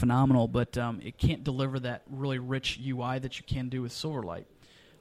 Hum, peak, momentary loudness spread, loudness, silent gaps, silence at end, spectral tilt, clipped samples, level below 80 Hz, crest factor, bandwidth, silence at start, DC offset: none; -10 dBFS; 11 LU; -31 LUFS; none; 0.55 s; -6.5 dB/octave; under 0.1%; -46 dBFS; 20 dB; 12.5 kHz; 0 s; under 0.1%